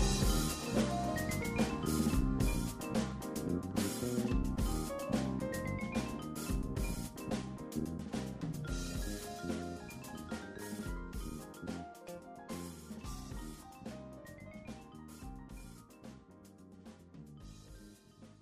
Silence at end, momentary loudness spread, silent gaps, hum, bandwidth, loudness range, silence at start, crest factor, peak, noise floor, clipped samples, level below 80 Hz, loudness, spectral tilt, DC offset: 0 s; 20 LU; none; none; 15.5 kHz; 16 LU; 0 s; 20 dB; -18 dBFS; -58 dBFS; under 0.1%; -44 dBFS; -39 LUFS; -5 dB/octave; under 0.1%